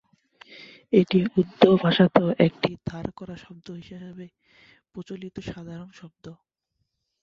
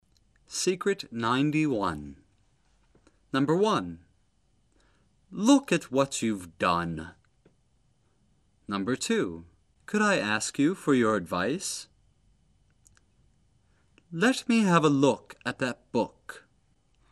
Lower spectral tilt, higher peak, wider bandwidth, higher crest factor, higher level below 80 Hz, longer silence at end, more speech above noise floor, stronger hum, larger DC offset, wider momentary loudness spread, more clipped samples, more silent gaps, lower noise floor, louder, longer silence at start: first, -8 dB/octave vs -4.5 dB/octave; first, 0 dBFS vs -6 dBFS; second, 7 kHz vs 13 kHz; about the same, 26 dB vs 22 dB; about the same, -58 dBFS vs -62 dBFS; first, 0.9 s vs 0.75 s; first, 54 dB vs 42 dB; neither; neither; first, 26 LU vs 17 LU; neither; neither; first, -78 dBFS vs -69 dBFS; first, -21 LUFS vs -27 LUFS; first, 0.9 s vs 0.5 s